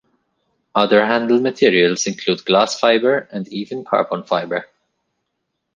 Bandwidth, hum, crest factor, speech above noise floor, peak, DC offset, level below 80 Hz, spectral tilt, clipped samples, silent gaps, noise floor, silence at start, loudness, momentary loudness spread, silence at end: 9.6 kHz; none; 18 dB; 58 dB; 0 dBFS; under 0.1%; -64 dBFS; -4 dB/octave; under 0.1%; none; -75 dBFS; 0.75 s; -17 LUFS; 12 LU; 1.1 s